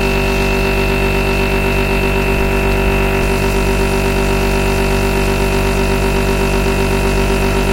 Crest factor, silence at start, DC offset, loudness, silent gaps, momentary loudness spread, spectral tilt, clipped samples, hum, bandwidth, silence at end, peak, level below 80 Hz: 12 dB; 0 s; under 0.1%; -15 LUFS; none; 0 LU; -5.5 dB/octave; under 0.1%; none; 16 kHz; 0 s; 0 dBFS; -18 dBFS